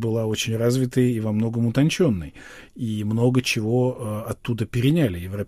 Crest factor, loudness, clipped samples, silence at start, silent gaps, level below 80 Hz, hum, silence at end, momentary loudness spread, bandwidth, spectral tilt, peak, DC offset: 14 dB; -23 LUFS; under 0.1%; 0 s; none; -48 dBFS; none; 0 s; 10 LU; 15.5 kHz; -6 dB/octave; -8 dBFS; under 0.1%